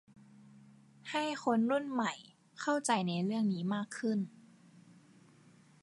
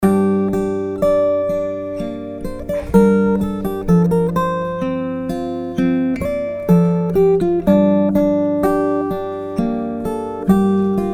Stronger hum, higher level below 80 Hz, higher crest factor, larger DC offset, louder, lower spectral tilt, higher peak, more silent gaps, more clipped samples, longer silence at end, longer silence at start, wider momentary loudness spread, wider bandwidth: neither; second, -84 dBFS vs -38 dBFS; about the same, 20 dB vs 16 dB; neither; second, -34 LUFS vs -17 LUFS; second, -5 dB/octave vs -9 dB/octave; second, -18 dBFS vs 0 dBFS; neither; neither; first, 1.55 s vs 0 s; first, 0.55 s vs 0 s; about the same, 11 LU vs 9 LU; second, 11.5 kHz vs 15 kHz